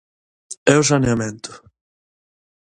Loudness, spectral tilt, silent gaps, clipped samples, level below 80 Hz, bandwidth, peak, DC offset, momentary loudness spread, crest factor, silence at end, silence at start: -17 LUFS; -4.5 dB/octave; 0.57-0.66 s; under 0.1%; -48 dBFS; 11.5 kHz; 0 dBFS; under 0.1%; 21 LU; 22 dB; 1.15 s; 0.5 s